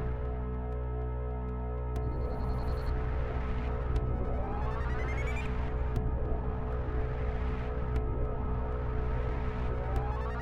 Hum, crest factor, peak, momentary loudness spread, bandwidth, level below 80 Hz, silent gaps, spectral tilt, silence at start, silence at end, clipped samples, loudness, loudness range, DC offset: none; 14 dB; -18 dBFS; 3 LU; 4.9 kHz; -34 dBFS; none; -8.5 dB/octave; 0 s; 0 s; under 0.1%; -35 LUFS; 1 LU; under 0.1%